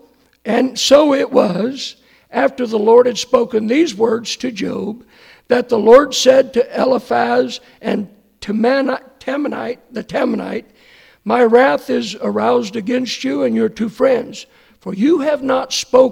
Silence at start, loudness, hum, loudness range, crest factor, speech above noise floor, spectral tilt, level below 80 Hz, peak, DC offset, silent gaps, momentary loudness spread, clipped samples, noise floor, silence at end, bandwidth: 0.45 s; -15 LUFS; none; 5 LU; 16 dB; 33 dB; -4 dB/octave; -54 dBFS; 0 dBFS; under 0.1%; none; 15 LU; under 0.1%; -47 dBFS; 0 s; 15.5 kHz